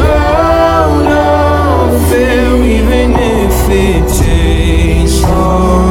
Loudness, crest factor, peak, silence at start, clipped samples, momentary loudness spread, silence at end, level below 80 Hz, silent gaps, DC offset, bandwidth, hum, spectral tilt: -9 LUFS; 8 dB; 0 dBFS; 0 s; under 0.1%; 2 LU; 0 s; -12 dBFS; none; under 0.1%; 17 kHz; none; -6 dB/octave